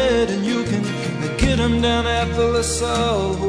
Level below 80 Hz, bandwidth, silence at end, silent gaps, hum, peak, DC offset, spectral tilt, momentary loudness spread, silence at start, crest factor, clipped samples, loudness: -30 dBFS; 11 kHz; 0 s; none; none; -4 dBFS; under 0.1%; -5 dB/octave; 5 LU; 0 s; 16 dB; under 0.1%; -19 LUFS